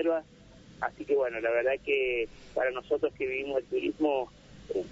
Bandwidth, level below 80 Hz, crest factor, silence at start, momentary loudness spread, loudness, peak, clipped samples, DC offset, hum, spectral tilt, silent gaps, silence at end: 7.8 kHz; -60 dBFS; 16 dB; 0 s; 8 LU; -31 LUFS; -16 dBFS; under 0.1%; under 0.1%; none; -5.5 dB/octave; none; 0 s